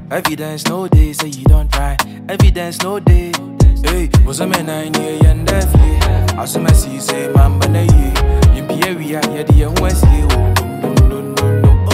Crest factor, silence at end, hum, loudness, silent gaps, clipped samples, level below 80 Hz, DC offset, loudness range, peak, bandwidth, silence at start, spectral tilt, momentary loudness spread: 12 dB; 0 s; none; -13 LUFS; none; under 0.1%; -14 dBFS; under 0.1%; 2 LU; 0 dBFS; 16 kHz; 0 s; -5.5 dB/octave; 7 LU